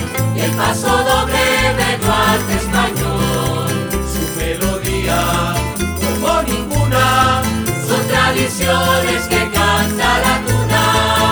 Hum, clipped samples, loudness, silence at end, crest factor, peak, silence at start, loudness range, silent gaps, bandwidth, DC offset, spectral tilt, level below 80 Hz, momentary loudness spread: none; under 0.1%; -15 LUFS; 0 s; 14 dB; 0 dBFS; 0 s; 3 LU; none; over 20 kHz; under 0.1%; -4 dB/octave; -28 dBFS; 6 LU